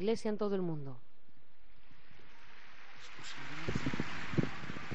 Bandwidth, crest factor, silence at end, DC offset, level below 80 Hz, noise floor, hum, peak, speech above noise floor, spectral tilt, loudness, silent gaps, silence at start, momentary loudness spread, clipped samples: 8 kHz; 22 dB; 0 s; 1%; -62 dBFS; -70 dBFS; none; -18 dBFS; 32 dB; -5.5 dB/octave; -39 LUFS; none; 0 s; 22 LU; under 0.1%